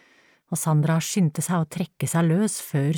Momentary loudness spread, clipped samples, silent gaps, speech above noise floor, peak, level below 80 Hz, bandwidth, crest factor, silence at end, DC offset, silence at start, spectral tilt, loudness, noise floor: 7 LU; under 0.1%; none; 36 dB; -12 dBFS; -66 dBFS; 18.5 kHz; 12 dB; 0 s; under 0.1%; 0.5 s; -5.5 dB/octave; -24 LUFS; -59 dBFS